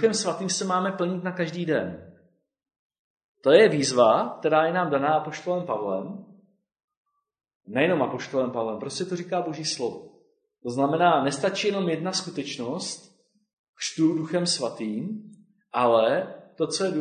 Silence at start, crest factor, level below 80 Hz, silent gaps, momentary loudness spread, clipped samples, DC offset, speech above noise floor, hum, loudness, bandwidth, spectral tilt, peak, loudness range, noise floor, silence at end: 0 s; 22 dB; -70 dBFS; 2.79-2.90 s, 2.99-3.17 s, 3.24-3.35 s, 6.84-6.88 s, 6.97-7.05 s, 7.55-7.60 s, 13.53-13.73 s; 13 LU; under 0.1%; under 0.1%; 39 dB; none; -25 LUFS; 9.6 kHz; -4.5 dB/octave; -2 dBFS; 7 LU; -63 dBFS; 0 s